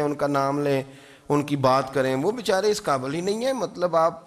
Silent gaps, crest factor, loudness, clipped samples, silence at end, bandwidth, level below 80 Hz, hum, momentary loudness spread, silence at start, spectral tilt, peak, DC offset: none; 16 dB; -24 LUFS; under 0.1%; 0.05 s; 14.5 kHz; -60 dBFS; none; 5 LU; 0 s; -5.5 dB/octave; -8 dBFS; under 0.1%